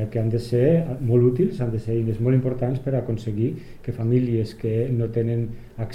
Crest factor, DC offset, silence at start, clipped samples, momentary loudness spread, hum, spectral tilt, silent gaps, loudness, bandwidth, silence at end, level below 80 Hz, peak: 14 dB; under 0.1%; 0 s; under 0.1%; 8 LU; none; -10 dB/octave; none; -23 LUFS; 9.8 kHz; 0 s; -44 dBFS; -8 dBFS